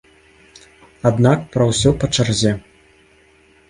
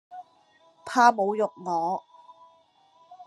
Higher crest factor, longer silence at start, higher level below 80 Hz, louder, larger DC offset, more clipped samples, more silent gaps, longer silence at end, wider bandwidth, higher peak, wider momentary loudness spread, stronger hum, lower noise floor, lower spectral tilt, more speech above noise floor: second, 18 dB vs 24 dB; first, 1.05 s vs 0.1 s; first, -40 dBFS vs -86 dBFS; first, -17 LUFS vs -24 LUFS; neither; neither; neither; first, 1.1 s vs 0.05 s; about the same, 11.5 kHz vs 12.5 kHz; first, 0 dBFS vs -4 dBFS; second, 5 LU vs 26 LU; neither; second, -52 dBFS vs -61 dBFS; about the same, -5.5 dB/octave vs -4.5 dB/octave; about the same, 36 dB vs 37 dB